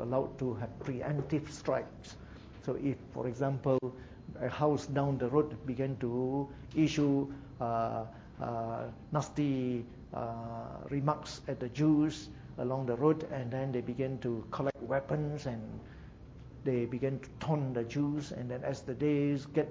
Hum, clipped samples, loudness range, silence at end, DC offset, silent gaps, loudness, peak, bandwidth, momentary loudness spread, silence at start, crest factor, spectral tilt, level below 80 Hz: none; under 0.1%; 4 LU; 0 s; under 0.1%; none; -35 LUFS; -14 dBFS; 7.8 kHz; 12 LU; 0 s; 20 dB; -7.5 dB/octave; -58 dBFS